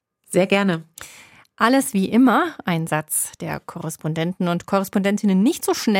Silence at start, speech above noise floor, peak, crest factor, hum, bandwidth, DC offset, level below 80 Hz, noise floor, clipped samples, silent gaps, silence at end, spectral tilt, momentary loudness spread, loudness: 0.3 s; 28 dB; -2 dBFS; 18 dB; none; 17 kHz; under 0.1%; -62 dBFS; -47 dBFS; under 0.1%; none; 0 s; -5 dB/octave; 13 LU; -20 LUFS